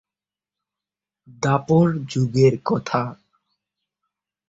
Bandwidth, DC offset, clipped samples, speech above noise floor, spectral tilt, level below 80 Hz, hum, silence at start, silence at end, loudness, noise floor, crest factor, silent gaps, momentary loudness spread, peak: 7.8 kHz; under 0.1%; under 0.1%; over 71 dB; -7 dB/octave; -56 dBFS; none; 1.4 s; 1.35 s; -20 LUFS; under -90 dBFS; 20 dB; none; 8 LU; -4 dBFS